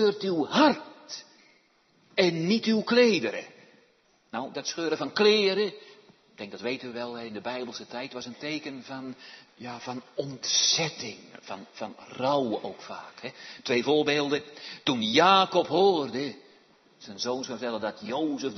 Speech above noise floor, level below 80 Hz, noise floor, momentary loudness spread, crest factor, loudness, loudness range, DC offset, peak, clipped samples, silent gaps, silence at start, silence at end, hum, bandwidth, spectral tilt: 37 dB; -76 dBFS; -65 dBFS; 20 LU; 20 dB; -26 LUFS; 11 LU; under 0.1%; -8 dBFS; under 0.1%; none; 0 s; 0 s; none; 6.4 kHz; -3.5 dB/octave